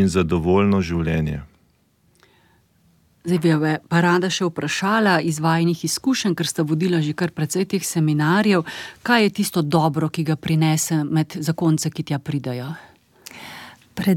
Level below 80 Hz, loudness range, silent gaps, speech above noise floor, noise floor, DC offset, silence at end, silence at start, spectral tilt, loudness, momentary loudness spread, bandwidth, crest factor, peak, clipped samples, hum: -46 dBFS; 4 LU; none; 41 dB; -61 dBFS; under 0.1%; 0 s; 0 s; -5.5 dB/octave; -20 LUFS; 13 LU; 17 kHz; 18 dB; -2 dBFS; under 0.1%; none